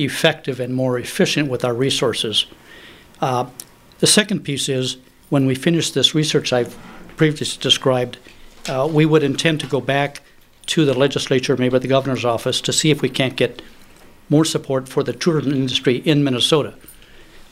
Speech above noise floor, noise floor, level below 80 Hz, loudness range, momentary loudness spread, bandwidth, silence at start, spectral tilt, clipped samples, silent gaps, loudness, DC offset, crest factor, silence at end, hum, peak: 26 dB; -44 dBFS; -50 dBFS; 2 LU; 10 LU; 16 kHz; 0 s; -4.5 dB/octave; under 0.1%; none; -18 LUFS; under 0.1%; 20 dB; 0.1 s; none; 0 dBFS